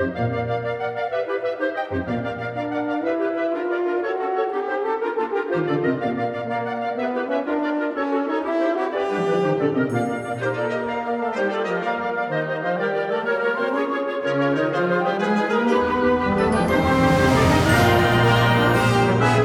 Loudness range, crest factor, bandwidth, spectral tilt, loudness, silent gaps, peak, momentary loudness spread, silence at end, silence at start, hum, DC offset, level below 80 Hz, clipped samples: 7 LU; 16 dB; 17.5 kHz; -6.5 dB/octave; -21 LUFS; none; -4 dBFS; 9 LU; 0 s; 0 s; none; under 0.1%; -44 dBFS; under 0.1%